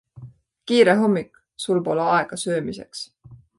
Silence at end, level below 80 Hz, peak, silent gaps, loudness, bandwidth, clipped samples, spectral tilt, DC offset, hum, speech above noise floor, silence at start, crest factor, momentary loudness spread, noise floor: 0.25 s; -62 dBFS; -2 dBFS; none; -21 LUFS; 11.5 kHz; under 0.1%; -5 dB/octave; under 0.1%; none; 24 dB; 0.15 s; 20 dB; 20 LU; -44 dBFS